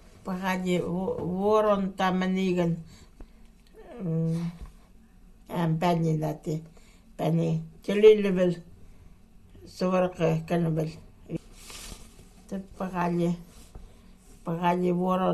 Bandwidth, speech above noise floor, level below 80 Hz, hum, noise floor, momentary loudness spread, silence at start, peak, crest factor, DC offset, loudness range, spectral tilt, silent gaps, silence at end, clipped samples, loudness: 12.5 kHz; 27 dB; -52 dBFS; none; -53 dBFS; 16 LU; 0.25 s; -6 dBFS; 22 dB; under 0.1%; 8 LU; -7.5 dB/octave; none; 0 s; under 0.1%; -27 LUFS